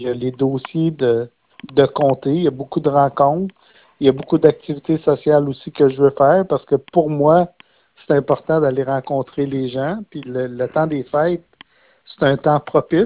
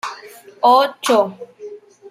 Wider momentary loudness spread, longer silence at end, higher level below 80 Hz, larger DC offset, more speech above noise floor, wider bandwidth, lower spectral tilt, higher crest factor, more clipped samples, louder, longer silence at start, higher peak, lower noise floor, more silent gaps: second, 9 LU vs 23 LU; about the same, 0 s vs 0 s; first, -52 dBFS vs -74 dBFS; neither; first, 32 dB vs 21 dB; second, 4 kHz vs 16 kHz; first, -11.5 dB/octave vs -3 dB/octave; about the same, 18 dB vs 16 dB; neither; about the same, -18 LUFS vs -16 LUFS; about the same, 0 s vs 0.05 s; about the same, 0 dBFS vs -2 dBFS; first, -49 dBFS vs -37 dBFS; neither